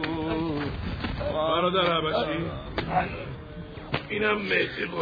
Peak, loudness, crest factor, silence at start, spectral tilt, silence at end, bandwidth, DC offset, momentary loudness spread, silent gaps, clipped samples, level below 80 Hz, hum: -8 dBFS; -27 LUFS; 18 dB; 0 s; -7.5 dB/octave; 0 s; 5 kHz; under 0.1%; 11 LU; none; under 0.1%; -44 dBFS; none